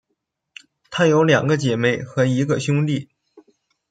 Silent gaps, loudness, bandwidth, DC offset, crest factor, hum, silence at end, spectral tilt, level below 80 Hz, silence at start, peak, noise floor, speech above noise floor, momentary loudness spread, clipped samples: none; -19 LUFS; 9.2 kHz; under 0.1%; 18 dB; none; 0.5 s; -6 dB/octave; -60 dBFS; 0.9 s; -2 dBFS; -76 dBFS; 58 dB; 7 LU; under 0.1%